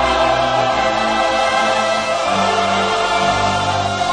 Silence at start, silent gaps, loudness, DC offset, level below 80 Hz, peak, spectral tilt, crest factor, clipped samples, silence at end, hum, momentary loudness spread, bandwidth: 0 s; none; -16 LUFS; 0.3%; -40 dBFS; -4 dBFS; -3.5 dB/octave; 12 dB; under 0.1%; 0 s; none; 2 LU; 10.5 kHz